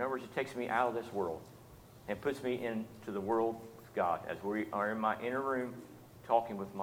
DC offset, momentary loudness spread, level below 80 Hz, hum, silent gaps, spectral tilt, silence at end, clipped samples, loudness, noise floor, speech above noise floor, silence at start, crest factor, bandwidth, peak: under 0.1%; 16 LU; -70 dBFS; none; none; -6 dB/octave; 0 s; under 0.1%; -36 LUFS; -56 dBFS; 20 dB; 0 s; 22 dB; 18 kHz; -16 dBFS